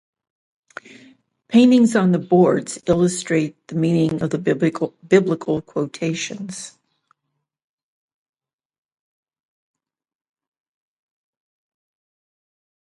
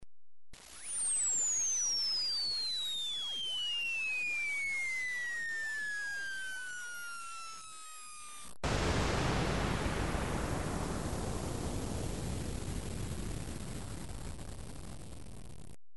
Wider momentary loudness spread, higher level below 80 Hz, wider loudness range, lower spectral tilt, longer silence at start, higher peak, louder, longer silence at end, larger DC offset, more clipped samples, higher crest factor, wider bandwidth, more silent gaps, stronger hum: second, 14 LU vs 17 LU; second, -58 dBFS vs -46 dBFS; first, 13 LU vs 10 LU; first, -6 dB/octave vs -2.5 dB/octave; first, 1.5 s vs 0 s; first, -2 dBFS vs -20 dBFS; first, -19 LUFS vs -35 LUFS; first, 6.1 s vs 0 s; second, under 0.1% vs 0.5%; neither; about the same, 20 dB vs 16 dB; about the same, 11.5 kHz vs 11.5 kHz; neither; neither